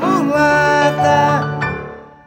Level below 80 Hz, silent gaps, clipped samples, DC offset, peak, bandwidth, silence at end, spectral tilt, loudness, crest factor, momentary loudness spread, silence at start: -44 dBFS; none; under 0.1%; under 0.1%; -2 dBFS; 18.5 kHz; 0.2 s; -5.5 dB/octave; -14 LUFS; 14 dB; 11 LU; 0 s